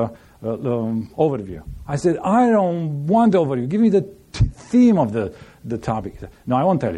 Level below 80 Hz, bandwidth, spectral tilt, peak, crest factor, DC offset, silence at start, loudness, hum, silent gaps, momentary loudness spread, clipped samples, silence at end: -38 dBFS; 10 kHz; -8 dB/octave; -6 dBFS; 14 dB; under 0.1%; 0 s; -19 LUFS; none; none; 15 LU; under 0.1%; 0 s